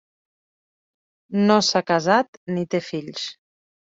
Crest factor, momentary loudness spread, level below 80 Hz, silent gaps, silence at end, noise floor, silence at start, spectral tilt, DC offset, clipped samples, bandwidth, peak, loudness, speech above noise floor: 22 dB; 13 LU; -66 dBFS; 2.28-2.46 s; 0.6 s; under -90 dBFS; 1.3 s; -4.5 dB/octave; under 0.1%; under 0.1%; 7.8 kHz; -2 dBFS; -21 LUFS; over 69 dB